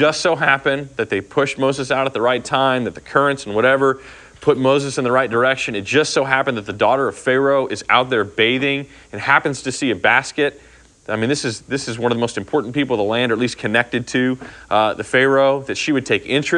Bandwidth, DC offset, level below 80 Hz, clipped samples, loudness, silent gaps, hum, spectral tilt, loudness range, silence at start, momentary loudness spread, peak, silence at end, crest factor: 10.5 kHz; under 0.1%; -54 dBFS; under 0.1%; -18 LUFS; none; none; -4.5 dB/octave; 3 LU; 0 s; 7 LU; 0 dBFS; 0 s; 18 dB